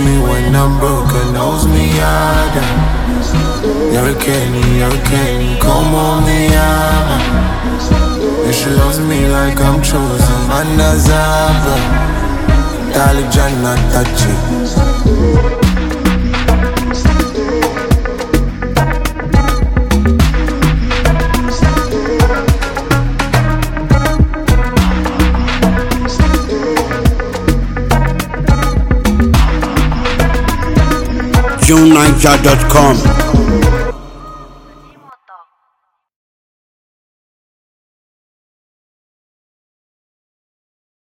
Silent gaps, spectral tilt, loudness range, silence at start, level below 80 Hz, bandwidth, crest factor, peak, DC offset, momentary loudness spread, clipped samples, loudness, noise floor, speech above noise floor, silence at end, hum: none; -5.5 dB/octave; 4 LU; 0 s; -16 dBFS; 17.5 kHz; 12 dB; 0 dBFS; under 0.1%; 5 LU; 0.2%; -12 LUFS; -65 dBFS; 55 dB; 5.7 s; none